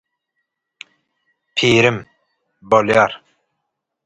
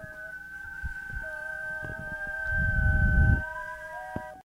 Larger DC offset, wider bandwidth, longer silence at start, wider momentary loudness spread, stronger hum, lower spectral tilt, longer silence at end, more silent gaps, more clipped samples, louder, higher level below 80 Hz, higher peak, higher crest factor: neither; second, 11.5 kHz vs 13 kHz; first, 1.55 s vs 0 s; about the same, 14 LU vs 15 LU; neither; second, -5 dB/octave vs -7.5 dB/octave; first, 0.9 s vs 0.05 s; neither; neither; first, -15 LUFS vs -30 LUFS; second, -54 dBFS vs -32 dBFS; first, 0 dBFS vs -10 dBFS; about the same, 20 dB vs 18 dB